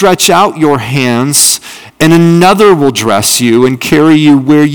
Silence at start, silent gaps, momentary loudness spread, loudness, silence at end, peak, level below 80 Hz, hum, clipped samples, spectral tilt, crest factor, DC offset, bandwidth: 0 s; none; 5 LU; -7 LUFS; 0 s; 0 dBFS; -42 dBFS; none; 8%; -4 dB/octave; 6 dB; under 0.1%; over 20 kHz